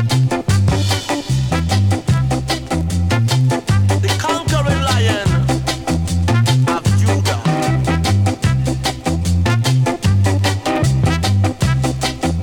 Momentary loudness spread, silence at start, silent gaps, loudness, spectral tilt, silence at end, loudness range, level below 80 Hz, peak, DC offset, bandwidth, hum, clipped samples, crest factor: 4 LU; 0 s; none; -16 LUFS; -5.5 dB/octave; 0 s; 1 LU; -30 dBFS; -2 dBFS; under 0.1%; 17 kHz; none; under 0.1%; 14 dB